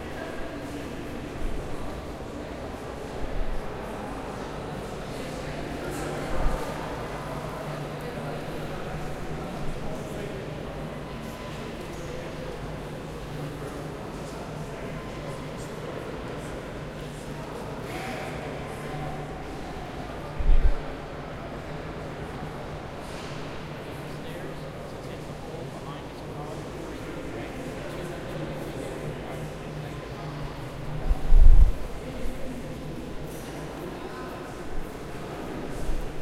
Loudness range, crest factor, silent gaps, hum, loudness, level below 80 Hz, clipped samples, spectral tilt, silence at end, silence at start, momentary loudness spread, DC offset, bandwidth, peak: 8 LU; 26 dB; none; none; -34 LUFS; -30 dBFS; under 0.1%; -6 dB/octave; 0 s; 0 s; 5 LU; under 0.1%; 13 kHz; -2 dBFS